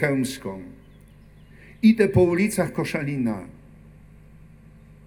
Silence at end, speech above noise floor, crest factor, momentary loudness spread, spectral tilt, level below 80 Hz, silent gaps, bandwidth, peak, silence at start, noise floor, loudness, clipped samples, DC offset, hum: 1.55 s; 27 dB; 18 dB; 19 LU; -6.5 dB/octave; -50 dBFS; none; 18.5 kHz; -6 dBFS; 0 s; -49 dBFS; -22 LUFS; under 0.1%; under 0.1%; 50 Hz at -50 dBFS